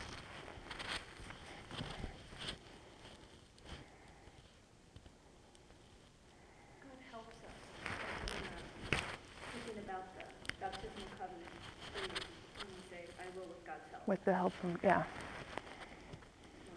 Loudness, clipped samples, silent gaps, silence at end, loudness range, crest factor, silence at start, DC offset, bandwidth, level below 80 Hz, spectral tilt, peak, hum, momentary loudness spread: -44 LUFS; under 0.1%; none; 0 s; 19 LU; 28 dB; 0 s; under 0.1%; 11 kHz; -60 dBFS; -4.5 dB/octave; -16 dBFS; none; 24 LU